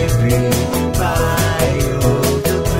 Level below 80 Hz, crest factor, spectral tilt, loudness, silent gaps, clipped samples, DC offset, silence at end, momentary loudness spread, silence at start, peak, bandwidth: -26 dBFS; 12 dB; -5.5 dB/octave; -16 LUFS; none; under 0.1%; under 0.1%; 0 s; 2 LU; 0 s; -2 dBFS; 16.5 kHz